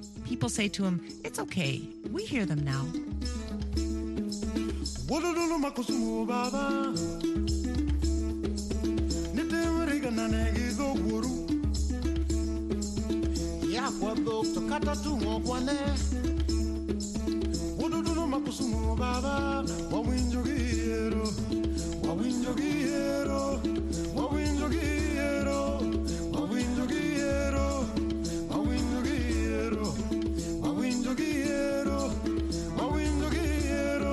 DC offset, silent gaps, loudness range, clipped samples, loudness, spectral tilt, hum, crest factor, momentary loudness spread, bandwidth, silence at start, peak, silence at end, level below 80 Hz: under 0.1%; none; 2 LU; under 0.1%; -31 LUFS; -5.5 dB/octave; none; 14 dB; 3 LU; 12.5 kHz; 0 s; -16 dBFS; 0 s; -36 dBFS